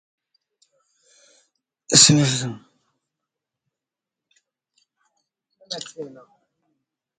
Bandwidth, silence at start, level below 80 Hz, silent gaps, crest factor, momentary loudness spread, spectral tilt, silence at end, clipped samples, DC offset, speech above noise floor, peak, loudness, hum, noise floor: 16 kHz; 1.9 s; -62 dBFS; none; 26 dB; 26 LU; -2.5 dB/octave; 1.1 s; under 0.1%; under 0.1%; 68 dB; 0 dBFS; -16 LUFS; none; -87 dBFS